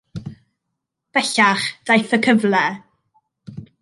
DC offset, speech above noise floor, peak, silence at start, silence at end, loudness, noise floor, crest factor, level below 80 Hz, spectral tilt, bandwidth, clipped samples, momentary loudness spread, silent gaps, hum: under 0.1%; 62 dB; -2 dBFS; 0.15 s; 0.15 s; -17 LUFS; -79 dBFS; 18 dB; -58 dBFS; -4 dB/octave; 11.5 kHz; under 0.1%; 23 LU; none; none